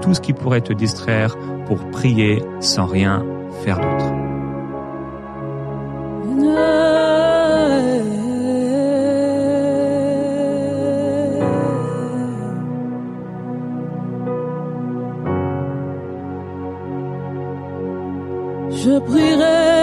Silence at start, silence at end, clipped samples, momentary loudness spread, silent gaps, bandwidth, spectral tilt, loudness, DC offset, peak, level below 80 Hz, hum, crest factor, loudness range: 0 s; 0 s; under 0.1%; 13 LU; none; 12.5 kHz; -6 dB/octave; -19 LUFS; under 0.1%; -2 dBFS; -46 dBFS; none; 16 dB; 9 LU